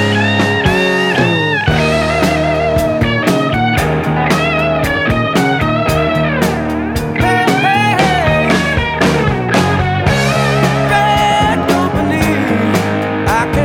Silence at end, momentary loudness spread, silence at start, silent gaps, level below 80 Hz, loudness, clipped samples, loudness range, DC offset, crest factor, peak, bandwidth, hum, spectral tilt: 0 s; 3 LU; 0 s; none; -30 dBFS; -13 LUFS; under 0.1%; 1 LU; under 0.1%; 12 dB; 0 dBFS; 18 kHz; none; -5.5 dB/octave